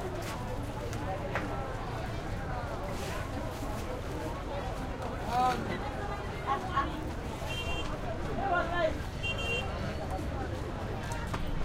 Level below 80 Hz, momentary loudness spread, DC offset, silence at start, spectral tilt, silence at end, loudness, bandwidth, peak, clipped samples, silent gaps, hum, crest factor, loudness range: -42 dBFS; 7 LU; under 0.1%; 0 s; -5.5 dB/octave; 0 s; -35 LUFS; 16 kHz; -18 dBFS; under 0.1%; none; none; 16 dB; 4 LU